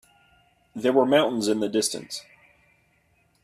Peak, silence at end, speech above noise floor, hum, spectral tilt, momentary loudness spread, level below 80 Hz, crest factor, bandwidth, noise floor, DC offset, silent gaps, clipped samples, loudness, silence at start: -6 dBFS; 1.2 s; 42 dB; none; -3.5 dB/octave; 17 LU; -68 dBFS; 20 dB; 15.5 kHz; -65 dBFS; under 0.1%; none; under 0.1%; -23 LUFS; 0.75 s